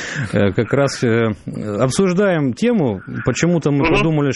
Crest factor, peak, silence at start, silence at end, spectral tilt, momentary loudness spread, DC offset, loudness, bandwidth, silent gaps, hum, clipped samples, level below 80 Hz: 16 dB; -2 dBFS; 0 s; 0 s; -6 dB/octave; 6 LU; under 0.1%; -17 LUFS; 11.5 kHz; none; none; under 0.1%; -40 dBFS